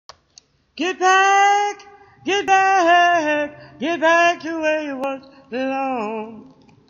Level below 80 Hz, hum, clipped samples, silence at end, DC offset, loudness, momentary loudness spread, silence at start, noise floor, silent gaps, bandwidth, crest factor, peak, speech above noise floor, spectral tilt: -64 dBFS; none; under 0.1%; 0.45 s; under 0.1%; -18 LUFS; 16 LU; 0.75 s; -53 dBFS; none; 7.6 kHz; 16 dB; -4 dBFS; 35 dB; -2 dB/octave